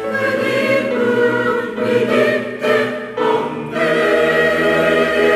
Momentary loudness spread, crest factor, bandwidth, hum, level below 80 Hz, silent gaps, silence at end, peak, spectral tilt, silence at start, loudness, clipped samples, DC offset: 5 LU; 12 dB; 15 kHz; none; -54 dBFS; none; 0 s; -4 dBFS; -5 dB/octave; 0 s; -16 LUFS; under 0.1%; under 0.1%